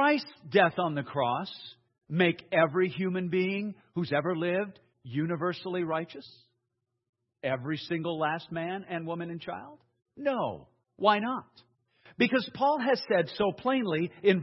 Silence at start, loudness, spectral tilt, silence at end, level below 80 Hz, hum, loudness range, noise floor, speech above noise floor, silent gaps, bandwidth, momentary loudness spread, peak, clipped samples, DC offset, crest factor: 0 s; -30 LUFS; -8.5 dB/octave; 0 s; -74 dBFS; none; 6 LU; -83 dBFS; 53 dB; 7.09-7.13 s; 6 kHz; 12 LU; -8 dBFS; under 0.1%; under 0.1%; 22 dB